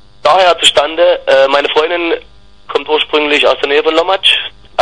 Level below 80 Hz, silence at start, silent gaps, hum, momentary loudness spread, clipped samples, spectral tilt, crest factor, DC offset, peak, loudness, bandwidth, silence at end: -46 dBFS; 0.25 s; none; 50 Hz at -50 dBFS; 8 LU; 0.2%; -1.5 dB/octave; 12 dB; 1%; 0 dBFS; -10 LUFS; 12 kHz; 0 s